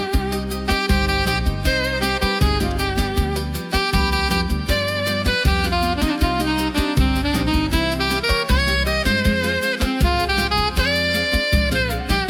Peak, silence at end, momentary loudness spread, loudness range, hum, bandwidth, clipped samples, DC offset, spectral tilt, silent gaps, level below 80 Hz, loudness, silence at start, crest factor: -4 dBFS; 0 s; 3 LU; 2 LU; none; 18 kHz; under 0.1%; under 0.1%; -5 dB/octave; none; -24 dBFS; -19 LUFS; 0 s; 14 dB